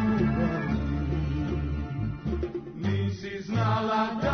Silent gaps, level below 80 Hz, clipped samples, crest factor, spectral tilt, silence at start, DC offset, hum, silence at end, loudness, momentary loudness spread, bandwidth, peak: none; -38 dBFS; under 0.1%; 14 dB; -8 dB/octave; 0 s; under 0.1%; none; 0 s; -29 LUFS; 7 LU; 6.6 kHz; -14 dBFS